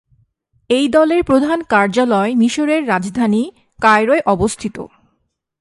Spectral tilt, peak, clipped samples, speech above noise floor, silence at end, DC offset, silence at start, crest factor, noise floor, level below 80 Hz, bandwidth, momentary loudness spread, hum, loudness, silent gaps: -5 dB/octave; 0 dBFS; under 0.1%; 54 dB; 0.75 s; under 0.1%; 0.7 s; 16 dB; -68 dBFS; -44 dBFS; 11.5 kHz; 10 LU; none; -15 LUFS; none